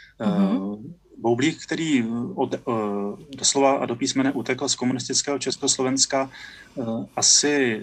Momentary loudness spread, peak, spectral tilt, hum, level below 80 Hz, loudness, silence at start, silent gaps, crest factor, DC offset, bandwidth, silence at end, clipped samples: 12 LU; -2 dBFS; -3 dB/octave; none; -62 dBFS; -22 LUFS; 0.2 s; none; 20 dB; under 0.1%; 11.5 kHz; 0 s; under 0.1%